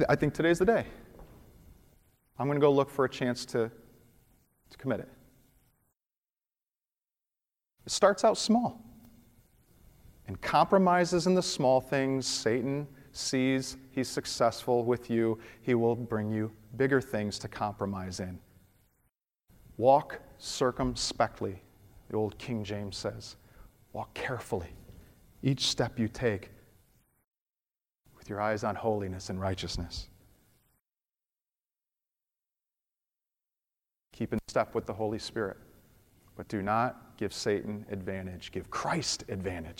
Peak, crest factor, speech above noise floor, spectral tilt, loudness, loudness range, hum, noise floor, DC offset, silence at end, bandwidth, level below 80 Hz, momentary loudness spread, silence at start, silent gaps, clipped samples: -10 dBFS; 22 dB; over 60 dB; -5 dB/octave; -31 LUFS; 10 LU; none; under -90 dBFS; under 0.1%; 0.05 s; 16.5 kHz; -56 dBFS; 16 LU; 0 s; 6.06-6.10 s, 6.18-6.22 s, 27.41-27.46 s; under 0.1%